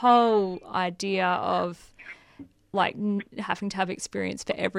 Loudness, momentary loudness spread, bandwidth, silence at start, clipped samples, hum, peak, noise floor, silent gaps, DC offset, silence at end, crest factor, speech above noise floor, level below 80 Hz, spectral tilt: -27 LUFS; 19 LU; 12 kHz; 0 s; under 0.1%; none; -8 dBFS; -50 dBFS; none; under 0.1%; 0 s; 18 dB; 24 dB; -64 dBFS; -5 dB/octave